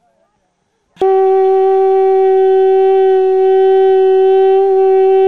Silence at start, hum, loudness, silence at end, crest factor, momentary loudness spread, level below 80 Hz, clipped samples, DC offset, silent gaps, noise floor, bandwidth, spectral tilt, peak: 1 s; none; -10 LUFS; 0 s; 6 dB; 1 LU; -62 dBFS; under 0.1%; 2%; none; -63 dBFS; 4.2 kHz; -6 dB/octave; -4 dBFS